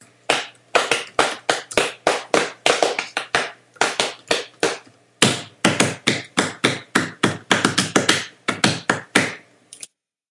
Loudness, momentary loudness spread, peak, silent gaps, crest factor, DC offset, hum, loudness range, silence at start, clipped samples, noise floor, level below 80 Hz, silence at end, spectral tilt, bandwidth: -20 LUFS; 6 LU; 0 dBFS; none; 22 dB; under 0.1%; none; 2 LU; 0.3 s; under 0.1%; -43 dBFS; -60 dBFS; 0.5 s; -2.5 dB/octave; 12 kHz